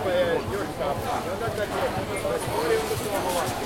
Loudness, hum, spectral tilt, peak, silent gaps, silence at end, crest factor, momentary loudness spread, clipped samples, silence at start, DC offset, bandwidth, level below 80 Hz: -27 LUFS; none; -4.5 dB/octave; -12 dBFS; none; 0 s; 16 dB; 4 LU; under 0.1%; 0 s; under 0.1%; 16.5 kHz; -46 dBFS